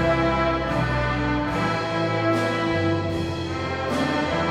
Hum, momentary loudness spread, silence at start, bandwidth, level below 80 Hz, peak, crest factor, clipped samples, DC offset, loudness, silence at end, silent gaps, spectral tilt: none; 5 LU; 0 s; 13 kHz; -38 dBFS; -10 dBFS; 14 dB; under 0.1%; under 0.1%; -23 LUFS; 0 s; none; -6.5 dB/octave